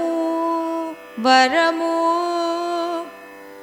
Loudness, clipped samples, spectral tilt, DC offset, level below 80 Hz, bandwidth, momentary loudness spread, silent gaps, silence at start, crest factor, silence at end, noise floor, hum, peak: -19 LUFS; under 0.1%; -2.5 dB/octave; under 0.1%; -68 dBFS; 18 kHz; 16 LU; none; 0 s; 18 dB; 0 s; -39 dBFS; 50 Hz at -70 dBFS; -2 dBFS